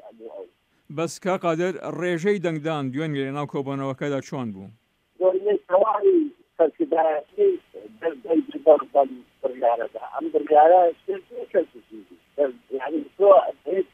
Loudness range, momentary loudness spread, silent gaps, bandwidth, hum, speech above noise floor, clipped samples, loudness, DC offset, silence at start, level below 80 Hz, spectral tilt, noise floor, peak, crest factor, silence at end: 6 LU; 15 LU; none; 10.5 kHz; none; 24 dB; under 0.1%; -23 LUFS; under 0.1%; 0.05 s; -74 dBFS; -6.5 dB/octave; -46 dBFS; -4 dBFS; 20 dB; 0.1 s